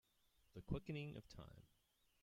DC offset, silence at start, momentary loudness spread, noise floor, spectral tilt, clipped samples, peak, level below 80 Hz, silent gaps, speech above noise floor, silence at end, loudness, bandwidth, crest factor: under 0.1%; 0.55 s; 15 LU; -79 dBFS; -7.5 dB/octave; under 0.1%; -30 dBFS; -66 dBFS; none; 28 dB; 0.55 s; -52 LUFS; 16 kHz; 24 dB